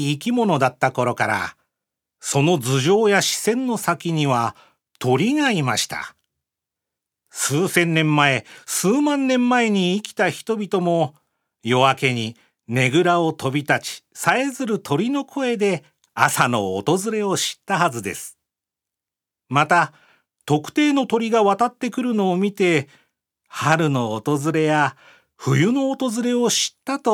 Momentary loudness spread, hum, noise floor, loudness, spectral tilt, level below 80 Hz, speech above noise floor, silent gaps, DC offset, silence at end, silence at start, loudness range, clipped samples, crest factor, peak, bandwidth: 9 LU; none; -87 dBFS; -20 LUFS; -4.5 dB/octave; -70 dBFS; 68 dB; none; under 0.1%; 0 s; 0 s; 3 LU; under 0.1%; 20 dB; 0 dBFS; 18.5 kHz